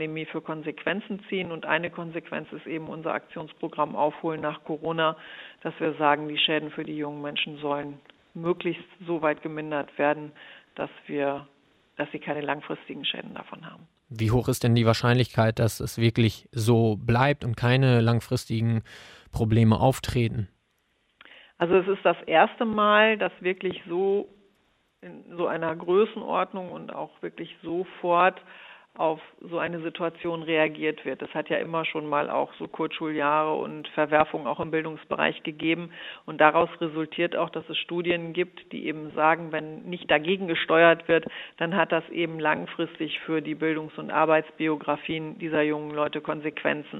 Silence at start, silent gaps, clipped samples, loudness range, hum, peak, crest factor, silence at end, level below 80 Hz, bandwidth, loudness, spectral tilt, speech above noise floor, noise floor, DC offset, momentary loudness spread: 0 s; none; under 0.1%; 7 LU; none; -2 dBFS; 24 dB; 0 s; -56 dBFS; 15 kHz; -26 LUFS; -6 dB/octave; 45 dB; -71 dBFS; under 0.1%; 15 LU